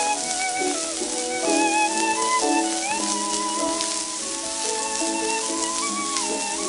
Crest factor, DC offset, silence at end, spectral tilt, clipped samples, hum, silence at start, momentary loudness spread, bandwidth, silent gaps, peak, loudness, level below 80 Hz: 20 dB; under 0.1%; 0 s; -0.5 dB/octave; under 0.1%; none; 0 s; 5 LU; 12 kHz; none; -4 dBFS; -23 LUFS; -60 dBFS